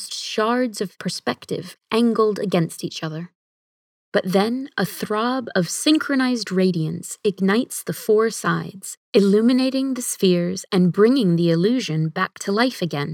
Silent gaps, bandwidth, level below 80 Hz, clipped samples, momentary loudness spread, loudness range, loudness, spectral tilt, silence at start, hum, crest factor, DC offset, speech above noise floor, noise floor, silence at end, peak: 3.35-4.12 s, 8.97-9.13 s; 18 kHz; -74 dBFS; under 0.1%; 10 LU; 5 LU; -21 LUFS; -5 dB/octave; 0 s; none; 18 dB; under 0.1%; over 70 dB; under -90 dBFS; 0 s; -4 dBFS